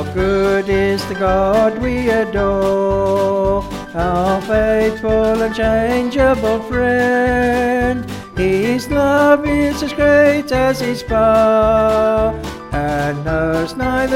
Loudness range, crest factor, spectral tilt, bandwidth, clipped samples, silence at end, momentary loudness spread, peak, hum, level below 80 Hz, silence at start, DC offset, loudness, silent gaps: 2 LU; 14 dB; -6 dB/octave; 16.5 kHz; under 0.1%; 0 s; 7 LU; 0 dBFS; none; -30 dBFS; 0 s; 0.1%; -15 LUFS; none